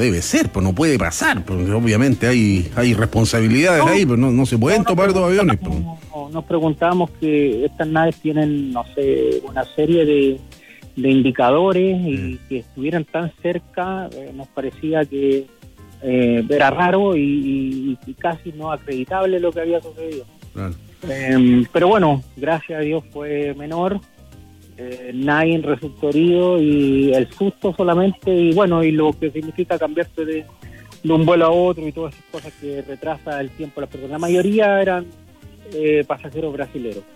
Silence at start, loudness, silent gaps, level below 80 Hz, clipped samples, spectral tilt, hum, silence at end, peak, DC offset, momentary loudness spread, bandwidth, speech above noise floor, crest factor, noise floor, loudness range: 0 s; -18 LUFS; none; -44 dBFS; under 0.1%; -6 dB/octave; none; 0.15 s; -4 dBFS; under 0.1%; 15 LU; 16 kHz; 26 dB; 14 dB; -43 dBFS; 7 LU